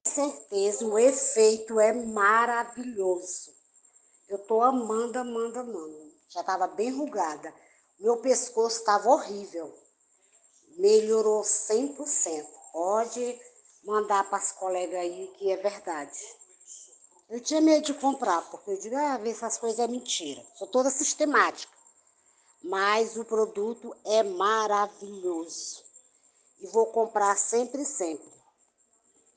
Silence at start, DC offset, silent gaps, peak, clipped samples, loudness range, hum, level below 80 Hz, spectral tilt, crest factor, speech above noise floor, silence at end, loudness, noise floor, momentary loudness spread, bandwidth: 0.05 s; under 0.1%; none; -8 dBFS; under 0.1%; 4 LU; none; -80 dBFS; -2 dB/octave; 20 dB; 41 dB; 1.15 s; -27 LUFS; -68 dBFS; 17 LU; 10 kHz